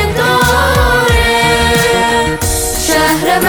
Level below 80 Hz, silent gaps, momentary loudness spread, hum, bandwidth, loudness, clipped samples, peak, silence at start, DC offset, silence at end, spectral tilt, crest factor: -20 dBFS; none; 4 LU; none; over 20 kHz; -10 LUFS; under 0.1%; 0 dBFS; 0 s; under 0.1%; 0 s; -3.5 dB/octave; 10 dB